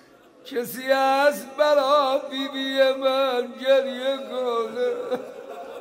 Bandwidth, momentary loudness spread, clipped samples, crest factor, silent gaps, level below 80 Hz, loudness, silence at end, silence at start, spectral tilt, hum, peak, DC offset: 16 kHz; 11 LU; under 0.1%; 16 dB; none; -78 dBFS; -23 LUFS; 0 s; 0.45 s; -2.5 dB/octave; none; -8 dBFS; under 0.1%